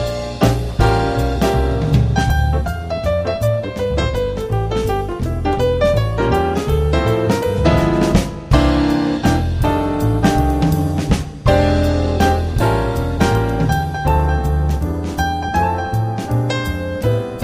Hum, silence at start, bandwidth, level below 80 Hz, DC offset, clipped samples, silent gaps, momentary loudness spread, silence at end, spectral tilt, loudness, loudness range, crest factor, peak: none; 0 s; 15.5 kHz; -22 dBFS; under 0.1%; under 0.1%; none; 5 LU; 0 s; -7 dB/octave; -17 LUFS; 3 LU; 16 dB; 0 dBFS